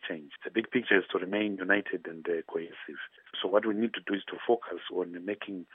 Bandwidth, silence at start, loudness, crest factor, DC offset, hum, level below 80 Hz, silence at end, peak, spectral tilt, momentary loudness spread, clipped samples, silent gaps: 3.9 kHz; 0 s; -31 LUFS; 24 dB; under 0.1%; none; -88 dBFS; 0.1 s; -8 dBFS; -8 dB/octave; 13 LU; under 0.1%; none